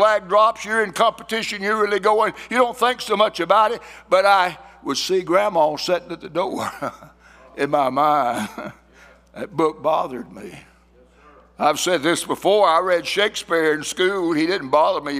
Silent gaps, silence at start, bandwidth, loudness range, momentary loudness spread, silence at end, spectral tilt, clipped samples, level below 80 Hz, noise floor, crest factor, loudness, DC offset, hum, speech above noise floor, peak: none; 0 s; 16 kHz; 5 LU; 13 LU; 0 s; -3.5 dB/octave; under 0.1%; -58 dBFS; -53 dBFS; 18 dB; -19 LUFS; under 0.1%; none; 33 dB; -2 dBFS